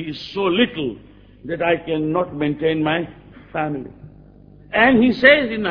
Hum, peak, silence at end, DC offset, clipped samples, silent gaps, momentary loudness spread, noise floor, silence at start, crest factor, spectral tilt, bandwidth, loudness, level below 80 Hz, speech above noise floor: none; 0 dBFS; 0 s; under 0.1%; under 0.1%; none; 18 LU; -45 dBFS; 0 s; 20 dB; -7.5 dB/octave; 5.4 kHz; -18 LUFS; -48 dBFS; 27 dB